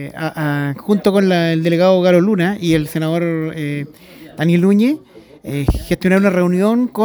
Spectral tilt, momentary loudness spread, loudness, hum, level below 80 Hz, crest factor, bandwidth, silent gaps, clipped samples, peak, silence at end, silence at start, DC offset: -7 dB/octave; 11 LU; -16 LUFS; none; -34 dBFS; 16 dB; over 20 kHz; none; under 0.1%; 0 dBFS; 0 s; 0 s; under 0.1%